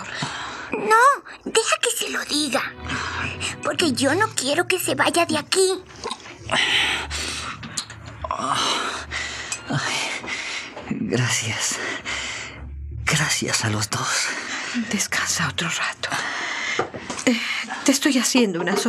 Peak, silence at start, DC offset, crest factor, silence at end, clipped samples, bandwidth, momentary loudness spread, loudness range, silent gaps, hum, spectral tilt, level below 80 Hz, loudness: -2 dBFS; 0 s; under 0.1%; 22 dB; 0 s; under 0.1%; 15.5 kHz; 11 LU; 4 LU; none; none; -2.5 dB/octave; -48 dBFS; -22 LUFS